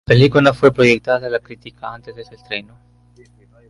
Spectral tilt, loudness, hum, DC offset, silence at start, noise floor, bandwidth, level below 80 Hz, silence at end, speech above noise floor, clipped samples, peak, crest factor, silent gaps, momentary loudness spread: -6.5 dB/octave; -15 LUFS; 60 Hz at -45 dBFS; under 0.1%; 0.1 s; -49 dBFS; 11 kHz; -46 dBFS; 1.1 s; 33 dB; under 0.1%; 0 dBFS; 16 dB; none; 21 LU